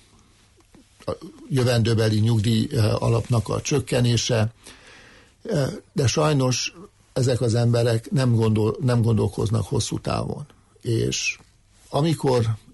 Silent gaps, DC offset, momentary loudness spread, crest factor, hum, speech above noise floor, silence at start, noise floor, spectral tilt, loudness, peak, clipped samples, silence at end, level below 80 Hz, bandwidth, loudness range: none; under 0.1%; 12 LU; 12 dB; none; 35 dB; 1.05 s; -56 dBFS; -5.5 dB/octave; -22 LUFS; -10 dBFS; under 0.1%; 0.15 s; -48 dBFS; 11.5 kHz; 3 LU